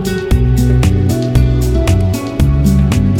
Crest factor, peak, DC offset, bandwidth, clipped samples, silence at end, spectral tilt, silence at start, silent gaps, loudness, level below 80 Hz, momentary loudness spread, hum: 10 dB; 0 dBFS; under 0.1%; 16.5 kHz; under 0.1%; 0 s; -7 dB/octave; 0 s; none; -13 LUFS; -16 dBFS; 3 LU; none